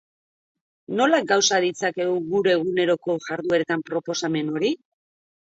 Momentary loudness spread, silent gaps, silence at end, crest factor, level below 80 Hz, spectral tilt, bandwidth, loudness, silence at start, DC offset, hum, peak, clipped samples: 8 LU; none; 0.85 s; 18 dB; -72 dBFS; -3.5 dB/octave; 8 kHz; -22 LUFS; 0.9 s; under 0.1%; none; -6 dBFS; under 0.1%